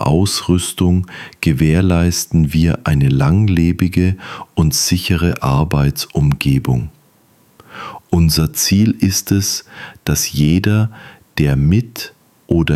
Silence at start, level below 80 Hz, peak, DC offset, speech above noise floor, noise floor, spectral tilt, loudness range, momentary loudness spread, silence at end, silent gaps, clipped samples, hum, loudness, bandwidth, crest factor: 0 s; -30 dBFS; -2 dBFS; under 0.1%; 38 dB; -52 dBFS; -5 dB/octave; 3 LU; 11 LU; 0 s; none; under 0.1%; none; -15 LUFS; 16 kHz; 14 dB